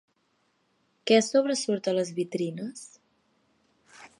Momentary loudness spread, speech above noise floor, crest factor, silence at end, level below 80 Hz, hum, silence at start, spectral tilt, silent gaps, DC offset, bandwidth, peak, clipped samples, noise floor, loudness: 16 LU; 45 dB; 22 dB; 0.15 s; -84 dBFS; none; 1.05 s; -4 dB/octave; none; under 0.1%; 11.5 kHz; -8 dBFS; under 0.1%; -72 dBFS; -26 LUFS